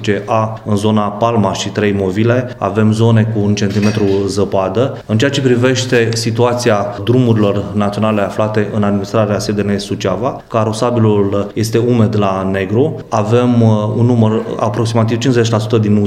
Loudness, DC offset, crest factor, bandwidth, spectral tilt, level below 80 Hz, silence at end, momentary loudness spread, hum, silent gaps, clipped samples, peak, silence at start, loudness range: -14 LUFS; under 0.1%; 12 dB; 13 kHz; -6.5 dB/octave; -46 dBFS; 0 s; 5 LU; none; none; under 0.1%; 0 dBFS; 0 s; 2 LU